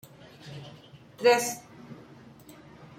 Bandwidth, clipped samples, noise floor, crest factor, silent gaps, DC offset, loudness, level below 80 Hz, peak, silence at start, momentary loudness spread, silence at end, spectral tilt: 16.5 kHz; under 0.1%; -51 dBFS; 24 dB; none; under 0.1%; -25 LUFS; -70 dBFS; -8 dBFS; 0.45 s; 28 LU; 1.05 s; -3 dB/octave